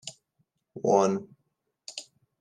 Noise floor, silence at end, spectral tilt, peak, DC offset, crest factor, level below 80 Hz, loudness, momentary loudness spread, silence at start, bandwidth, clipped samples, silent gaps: -78 dBFS; 0.4 s; -5.5 dB/octave; -8 dBFS; under 0.1%; 22 dB; -82 dBFS; -26 LUFS; 22 LU; 0.05 s; 11 kHz; under 0.1%; none